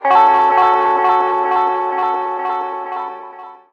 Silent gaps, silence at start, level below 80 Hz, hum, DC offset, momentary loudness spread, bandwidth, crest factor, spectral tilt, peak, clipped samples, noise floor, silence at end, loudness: none; 0 s; -60 dBFS; none; under 0.1%; 14 LU; 6.4 kHz; 14 dB; -4.5 dB/octave; -2 dBFS; under 0.1%; -35 dBFS; 0.15 s; -15 LUFS